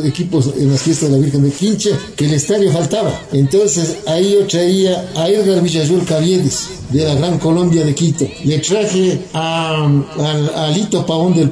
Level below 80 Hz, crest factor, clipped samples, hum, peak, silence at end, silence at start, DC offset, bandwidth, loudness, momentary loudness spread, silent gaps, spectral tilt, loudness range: -44 dBFS; 10 dB; under 0.1%; none; -4 dBFS; 0 s; 0 s; under 0.1%; 11 kHz; -14 LUFS; 4 LU; none; -5.5 dB/octave; 1 LU